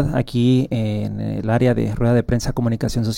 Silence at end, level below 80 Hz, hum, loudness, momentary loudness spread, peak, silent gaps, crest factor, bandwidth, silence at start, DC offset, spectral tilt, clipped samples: 0 s; -34 dBFS; none; -19 LUFS; 6 LU; -6 dBFS; none; 14 dB; 16 kHz; 0 s; under 0.1%; -7 dB/octave; under 0.1%